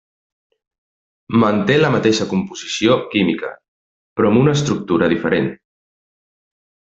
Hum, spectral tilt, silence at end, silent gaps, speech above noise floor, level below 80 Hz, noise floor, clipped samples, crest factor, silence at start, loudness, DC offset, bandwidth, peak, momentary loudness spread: none; -5.5 dB/octave; 1.4 s; 3.68-4.16 s; over 74 dB; -54 dBFS; under -90 dBFS; under 0.1%; 18 dB; 1.3 s; -17 LUFS; under 0.1%; 8 kHz; 0 dBFS; 10 LU